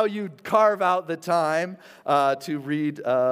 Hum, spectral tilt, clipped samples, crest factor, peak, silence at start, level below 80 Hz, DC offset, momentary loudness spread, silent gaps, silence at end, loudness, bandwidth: none; -5.5 dB/octave; under 0.1%; 18 dB; -6 dBFS; 0 s; -78 dBFS; under 0.1%; 9 LU; none; 0 s; -24 LUFS; 16 kHz